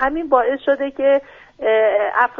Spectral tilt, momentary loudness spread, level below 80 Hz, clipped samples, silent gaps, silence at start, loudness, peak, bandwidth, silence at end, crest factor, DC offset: -5.5 dB/octave; 4 LU; -50 dBFS; under 0.1%; none; 0 s; -17 LUFS; -2 dBFS; 4 kHz; 0 s; 16 dB; under 0.1%